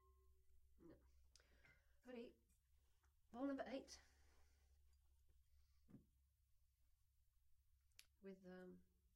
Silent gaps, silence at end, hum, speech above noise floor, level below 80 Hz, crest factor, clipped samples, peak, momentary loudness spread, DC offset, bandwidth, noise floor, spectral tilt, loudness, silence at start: none; 0.1 s; none; 28 dB; -80 dBFS; 24 dB; under 0.1%; -38 dBFS; 15 LU; under 0.1%; 16 kHz; -82 dBFS; -5 dB/octave; -56 LUFS; 0 s